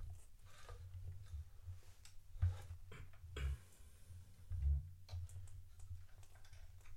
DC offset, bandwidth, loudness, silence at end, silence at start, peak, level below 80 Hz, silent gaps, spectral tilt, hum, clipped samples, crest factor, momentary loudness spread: under 0.1%; 16 kHz; -49 LUFS; 0 s; 0 s; -28 dBFS; -50 dBFS; none; -5.5 dB/octave; none; under 0.1%; 20 dB; 20 LU